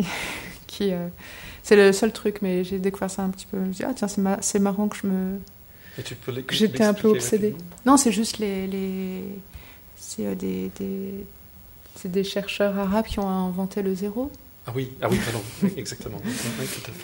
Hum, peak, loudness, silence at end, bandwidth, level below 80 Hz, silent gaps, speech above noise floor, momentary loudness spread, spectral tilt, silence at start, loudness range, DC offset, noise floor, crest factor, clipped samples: none; -4 dBFS; -25 LUFS; 0 s; 16.5 kHz; -50 dBFS; none; 22 dB; 18 LU; -5 dB/octave; 0 s; 7 LU; under 0.1%; -46 dBFS; 22 dB; under 0.1%